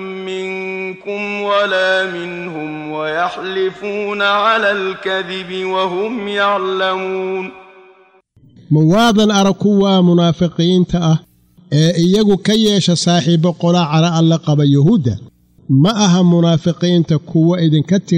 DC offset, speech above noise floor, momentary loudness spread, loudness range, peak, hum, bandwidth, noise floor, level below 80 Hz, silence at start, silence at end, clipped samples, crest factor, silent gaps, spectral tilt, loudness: under 0.1%; 36 dB; 11 LU; 5 LU; -2 dBFS; none; 9.8 kHz; -50 dBFS; -48 dBFS; 0 s; 0 s; under 0.1%; 12 dB; none; -6 dB/octave; -14 LUFS